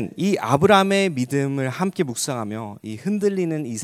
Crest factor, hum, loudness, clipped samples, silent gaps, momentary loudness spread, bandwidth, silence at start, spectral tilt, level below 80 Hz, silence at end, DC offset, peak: 20 dB; none; -21 LUFS; under 0.1%; none; 14 LU; 16 kHz; 0 s; -5 dB/octave; -56 dBFS; 0 s; under 0.1%; -2 dBFS